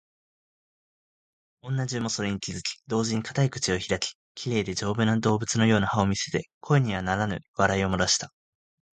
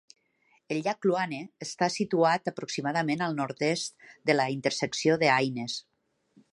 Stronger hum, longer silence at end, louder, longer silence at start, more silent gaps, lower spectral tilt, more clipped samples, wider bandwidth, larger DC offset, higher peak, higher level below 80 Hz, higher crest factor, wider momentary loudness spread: neither; about the same, 0.7 s vs 0.75 s; about the same, -26 LUFS vs -28 LUFS; first, 1.65 s vs 0.7 s; first, 4.15-4.35 s, 6.54-6.61 s, 7.48-7.54 s vs none; about the same, -4.5 dB/octave vs -4.5 dB/octave; neither; second, 9.4 kHz vs 11.5 kHz; neither; first, -4 dBFS vs -10 dBFS; first, -50 dBFS vs -76 dBFS; about the same, 22 dB vs 20 dB; about the same, 8 LU vs 10 LU